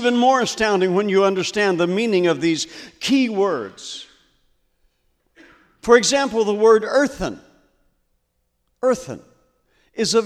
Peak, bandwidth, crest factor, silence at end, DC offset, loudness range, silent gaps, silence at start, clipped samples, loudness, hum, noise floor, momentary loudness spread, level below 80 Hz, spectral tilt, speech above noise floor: 0 dBFS; 14 kHz; 20 dB; 0 s; under 0.1%; 6 LU; none; 0 s; under 0.1%; -19 LUFS; none; -70 dBFS; 17 LU; -52 dBFS; -4 dB/octave; 52 dB